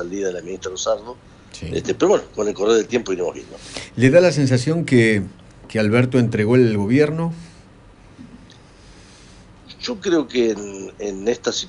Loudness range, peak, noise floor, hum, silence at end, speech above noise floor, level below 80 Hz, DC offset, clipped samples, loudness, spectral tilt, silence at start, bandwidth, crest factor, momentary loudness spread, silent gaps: 9 LU; -2 dBFS; -46 dBFS; none; 0 s; 27 dB; -50 dBFS; under 0.1%; under 0.1%; -19 LUFS; -6 dB/octave; 0 s; 11 kHz; 18 dB; 15 LU; none